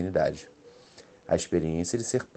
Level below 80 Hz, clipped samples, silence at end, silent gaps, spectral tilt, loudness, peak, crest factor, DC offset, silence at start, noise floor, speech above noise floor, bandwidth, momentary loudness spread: -52 dBFS; under 0.1%; 0.1 s; none; -5 dB/octave; -28 LUFS; -12 dBFS; 18 dB; under 0.1%; 0 s; -53 dBFS; 25 dB; 12 kHz; 11 LU